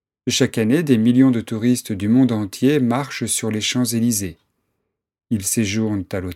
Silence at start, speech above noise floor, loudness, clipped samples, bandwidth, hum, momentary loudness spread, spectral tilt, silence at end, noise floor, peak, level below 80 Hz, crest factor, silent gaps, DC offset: 0.25 s; 57 dB; -19 LUFS; under 0.1%; 16 kHz; none; 7 LU; -5 dB/octave; 0 s; -75 dBFS; -2 dBFS; -56 dBFS; 18 dB; none; under 0.1%